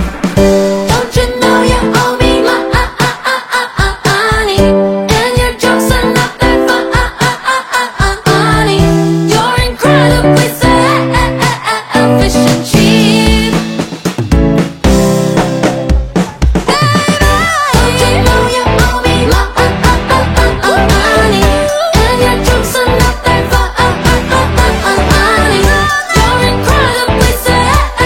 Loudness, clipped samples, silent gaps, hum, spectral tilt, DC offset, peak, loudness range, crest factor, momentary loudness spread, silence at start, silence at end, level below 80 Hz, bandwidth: -9 LUFS; 0.3%; none; none; -5 dB/octave; under 0.1%; 0 dBFS; 2 LU; 10 dB; 4 LU; 0 s; 0 s; -18 dBFS; 17 kHz